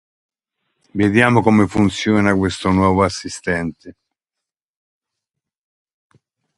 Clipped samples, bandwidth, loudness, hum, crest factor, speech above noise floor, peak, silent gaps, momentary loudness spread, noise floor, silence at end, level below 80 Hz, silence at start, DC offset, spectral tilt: under 0.1%; 11.5 kHz; -16 LUFS; none; 20 dB; 69 dB; 0 dBFS; none; 10 LU; -85 dBFS; 2.65 s; -42 dBFS; 0.95 s; under 0.1%; -6 dB/octave